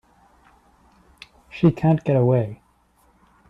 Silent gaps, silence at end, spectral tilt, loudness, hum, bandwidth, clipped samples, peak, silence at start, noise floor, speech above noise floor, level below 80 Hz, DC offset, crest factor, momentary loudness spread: none; 0.95 s; -10 dB/octave; -20 LUFS; 60 Hz at -50 dBFS; 6 kHz; under 0.1%; -6 dBFS; 1.55 s; -60 dBFS; 42 dB; -54 dBFS; under 0.1%; 18 dB; 12 LU